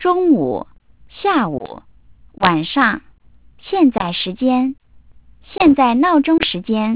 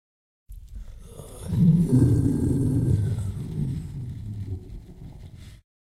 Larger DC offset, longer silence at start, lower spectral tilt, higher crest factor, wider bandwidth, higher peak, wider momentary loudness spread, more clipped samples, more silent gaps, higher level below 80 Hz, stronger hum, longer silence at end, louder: first, 0.4% vs under 0.1%; second, 0 s vs 0.5 s; about the same, -9.5 dB/octave vs -9 dB/octave; about the same, 16 dB vs 18 dB; second, 4 kHz vs 13.5 kHz; first, 0 dBFS vs -8 dBFS; second, 14 LU vs 25 LU; neither; neither; second, -48 dBFS vs -38 dBFS; neither; second, 0 s vs 0.35 s; first, -16 LUFS vs -24 LUFS